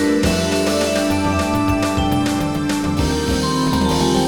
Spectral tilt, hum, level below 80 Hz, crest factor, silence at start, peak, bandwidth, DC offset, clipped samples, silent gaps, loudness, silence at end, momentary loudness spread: -5 dB/octave; none; -30 dBFS; 12 dB; 0 s; -4 dBFS; 19 kHz; 0.6%; under 0.1%; none; -18 LUFS; 0 s; 3 LU